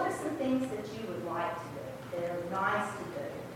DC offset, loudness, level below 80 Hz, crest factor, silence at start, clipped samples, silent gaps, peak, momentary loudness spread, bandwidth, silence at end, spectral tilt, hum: under 0.1%; -35 LUFS; -66 dBFS; 18 dB; 0 s; under 0.1%; none; -16 dBFS; 9 LU; 17 kHz; 0 s; -5.5 dB/octave; none